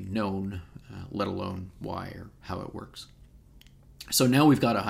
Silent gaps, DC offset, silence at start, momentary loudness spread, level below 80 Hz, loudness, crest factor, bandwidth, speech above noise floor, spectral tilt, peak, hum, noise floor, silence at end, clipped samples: none; under 0.1%; 0 s; 24 LU; -54 dBFS; -27 LUFS; 20 dB; 16 kHz; 27 dB; -5 dB/octave; -8 dBFS; none; -54 dBFS; 0 s; under 0.1%